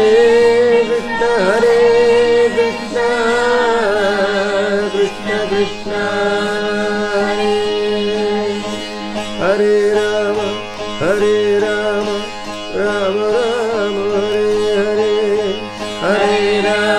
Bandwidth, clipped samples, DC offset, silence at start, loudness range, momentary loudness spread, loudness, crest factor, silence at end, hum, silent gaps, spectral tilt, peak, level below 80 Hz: 11.5 kHz; under 0.1%; under 0.1%; 0 s; 4 LU; 9 LU; -15 LUFS; 12 dB; 0 s; none; none; -4.5 dB/octave; -2 dBFS; -44 dBFS